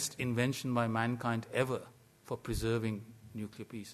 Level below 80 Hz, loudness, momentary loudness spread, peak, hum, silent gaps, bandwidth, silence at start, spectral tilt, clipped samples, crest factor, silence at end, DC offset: -54 dBFS; -36 LUFS; 12 LU; -16 dBFS; none; none; 13.5 kHz; 0 s; -5.5 dB/octave; under 0.1%; 20 dB; 0 s; under 0.1%